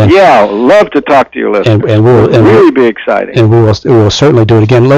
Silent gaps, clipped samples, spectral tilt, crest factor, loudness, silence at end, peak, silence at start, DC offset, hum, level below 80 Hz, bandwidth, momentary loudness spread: none; under 0.1%; -7 dB/octave; 6 dB; -6 LUFS; 0 s; 0 dBFS; 0 s; under 0.1%; none; -36 dBFS; 8.2 kHz; 5 LU